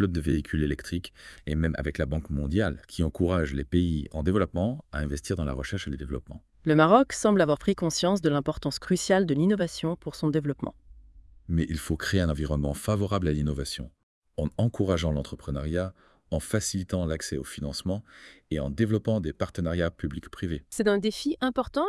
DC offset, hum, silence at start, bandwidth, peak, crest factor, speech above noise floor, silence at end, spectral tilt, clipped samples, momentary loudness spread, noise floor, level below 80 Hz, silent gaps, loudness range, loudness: under 0.1%; none; 0 s; 12 kHz; -6 dBFS; 22 dB; 25 dB; 0 s; -6 dB/octave; under 0.1%; 11 LU; -52 dBFS; -42 dBFS; 14.03-14.22 s; 6 LU; -28 LUFS